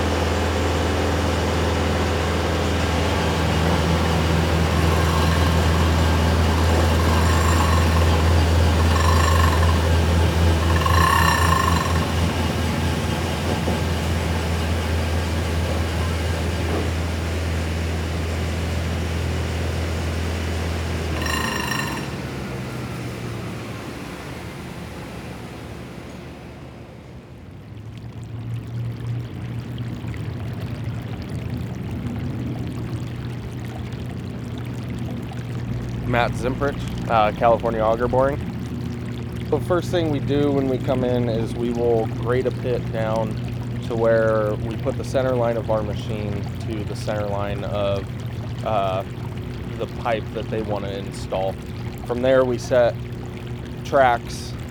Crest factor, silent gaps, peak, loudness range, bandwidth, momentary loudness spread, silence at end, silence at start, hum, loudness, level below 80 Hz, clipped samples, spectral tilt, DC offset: 20 dB; none; -2 dBFS; 13 LU; 19.5 kHz; 13 LU; 0 s; 0 s; none; -22 LUFS; -34 dBFS; under 0.1%; -6 dB/octave; under 0.1%